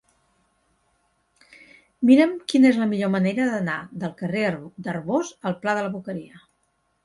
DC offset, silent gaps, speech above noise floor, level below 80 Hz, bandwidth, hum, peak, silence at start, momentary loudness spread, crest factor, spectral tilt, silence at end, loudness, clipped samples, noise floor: under 0.1%; none; 48 dB; -66 dBFS; 11.5 kHz; none; -4 dBFS; 2 s; 15 LU; 18 dB; -6.5 dB/octave; 0.65 s; -22 LUFS; under 0.1%; -70 dBFS